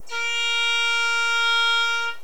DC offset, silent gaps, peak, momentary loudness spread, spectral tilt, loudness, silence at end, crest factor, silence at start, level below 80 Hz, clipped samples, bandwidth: 2%; none; -10 dBFS; 4 LU; 2.5 dB/octave; -20 LUFS; 0.05 s; 12 dB; 0.05 s; -76 dBFS; under 0.1%; 20 kHz